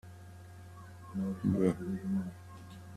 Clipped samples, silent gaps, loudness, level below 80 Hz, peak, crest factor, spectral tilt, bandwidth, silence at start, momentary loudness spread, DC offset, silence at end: under 0.1%; none; -35 LUFS; -64 dBFS; -16 dBFS; 22 dB; -8.5 dB/octave; 13 kHz; 0.05 s; 21 LU; under 0.1%; 0 s